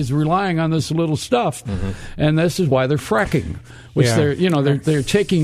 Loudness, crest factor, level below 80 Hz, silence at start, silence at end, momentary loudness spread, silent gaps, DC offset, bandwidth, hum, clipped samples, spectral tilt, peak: -19 LUFS; 16 dB; -38 dBFS; 0 s; 0 s; 9 LU; none; under 0.1%; 14.5 kHz; none; under 0.1%; -6 dB/octave; -2 dBFS